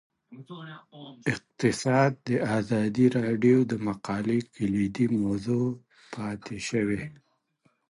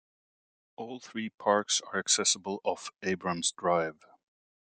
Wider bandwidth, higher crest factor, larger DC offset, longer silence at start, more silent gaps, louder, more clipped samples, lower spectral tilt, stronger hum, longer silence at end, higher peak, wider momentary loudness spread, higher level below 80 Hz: first, 11.5 kHz vs 10 kHz; about the same, 18 dB vs 22 dB; neither; second, 0.3 s vs 0.8 s; second, none vs 1.34-1.38 s; first, -27 LUFS vs -30 LUFS; neither; first, -6.5 dB/octave vs -2 dB/octave; neither; about the same, 0.75 s vs 0.8 s; about the same, -10 dBFS vs -12 dBFS; first, 19 LU vs 14 LU; first, -60 dBFS vs -76 dBFS